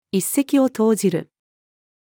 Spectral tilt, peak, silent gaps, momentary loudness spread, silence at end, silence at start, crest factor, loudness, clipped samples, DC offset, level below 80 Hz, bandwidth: -5.5 dB/octave; -6 dBFS; none; 5 LU; 0.85 s; 0.15 s; 14 dB; -19 LUFS; under 0.1%; under 0.1%; -76 dBFS; 20 kHz